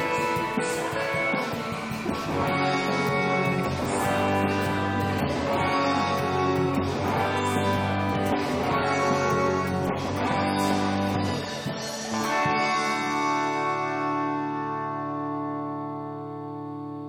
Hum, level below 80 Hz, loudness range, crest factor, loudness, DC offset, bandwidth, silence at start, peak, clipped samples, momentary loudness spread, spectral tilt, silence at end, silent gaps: none; -54 dBFS; 2 LU; 14 dB; -26 LUFS; under 0.1%; over 20 kHz; 0 s; -10 dBFS; under 0.1%; 7 LU; -5.5 dB/octave; 0 s; none